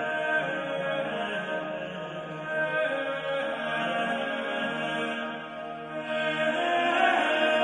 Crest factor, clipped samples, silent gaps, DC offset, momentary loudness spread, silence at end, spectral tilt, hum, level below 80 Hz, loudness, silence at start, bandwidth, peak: 18 dB; under 0.1%; none; under 0.1%; 12 LU; 0 s; -4.5 dB/octave; none; -70 dBFS; -29 LUFS; 0 s; 10.5 kHz; -10 dBFS